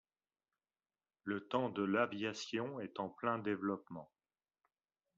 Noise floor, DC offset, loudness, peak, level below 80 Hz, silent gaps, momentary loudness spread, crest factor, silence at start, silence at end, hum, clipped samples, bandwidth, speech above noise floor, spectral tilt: under -90 dBFS; under 0.1%; -40 LUFS; -22 dBFS; -84 dBFS; none; 10 LU; 20 dB; 1.25 s; 1.15 s; none; under 0.1%; 7.4 kHz; over 51 dB; -4 dB/octave